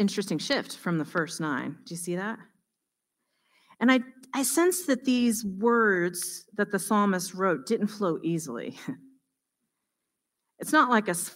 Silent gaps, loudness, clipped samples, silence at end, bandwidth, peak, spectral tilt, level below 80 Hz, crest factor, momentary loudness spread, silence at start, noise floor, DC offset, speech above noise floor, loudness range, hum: none; -27 LUFS; under 0.1%; 0 s; 16 kHz; -6 dBFS; -4 dB/octave; -74 dBFS; 22 dB; 13 LU; 0 s; -84 dBFS; under 0.1%; 57 dB; 7 LU; none